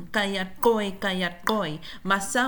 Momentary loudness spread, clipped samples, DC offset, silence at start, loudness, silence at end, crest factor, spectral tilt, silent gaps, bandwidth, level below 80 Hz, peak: 5 LU; under 0.1%; under 0.1%; 0 s; -26 LUFS; 0 s; 18 dB; -4 dB/octave; none; 19.5 kHz; -52 dBFS; -8 dBFS